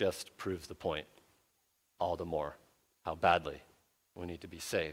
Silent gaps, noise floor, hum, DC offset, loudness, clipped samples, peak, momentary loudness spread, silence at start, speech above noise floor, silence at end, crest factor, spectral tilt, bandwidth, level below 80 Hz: none; -77 dBFS; none; under 0.1%; -37 LUFS; under 0.1%; -12 dBFS; 16 LU; 0 s; 41 dB; 0 s; 26 dB; -4.5 dB/octave; 16.5 kHz; -62 dBFS